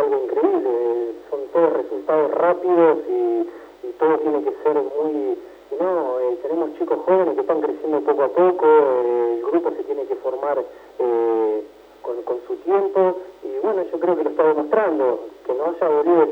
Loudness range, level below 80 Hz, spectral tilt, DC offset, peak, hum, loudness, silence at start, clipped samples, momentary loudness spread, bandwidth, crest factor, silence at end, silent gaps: 4 LU; -66 dBFS; -8 dB/octave; under 0.1%; -4 dBFS; none; -20 LUFS; 0 s; under 0.1%; 11 LU; 5 kHz; 16 dB; 0 s; none